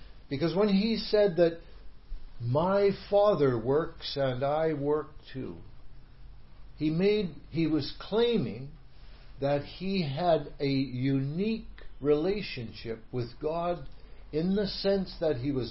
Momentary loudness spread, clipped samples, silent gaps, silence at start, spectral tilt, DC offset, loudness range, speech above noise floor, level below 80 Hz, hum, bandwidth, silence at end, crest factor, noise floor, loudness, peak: 13 LU; under 0.1%; none; 0.05 s; -10.5 dB/octave; 0.3%; 5 LU; 21 dB; -48 dBFS; none; 5.8 kHz; 0 s; 16 dB; -49 dBFS; -29 LUFS; -12 dBFS